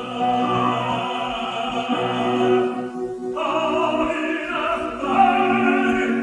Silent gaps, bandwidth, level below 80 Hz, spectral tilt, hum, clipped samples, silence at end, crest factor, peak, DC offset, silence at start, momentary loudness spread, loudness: none; 10.5 kHz; -52 dBFS; -5.5 dB/octave; none; under 0.1%; 0 s; 18 dB; -4 dBFS; under 0.1%; 0 s; 7 LU; -21 LUFS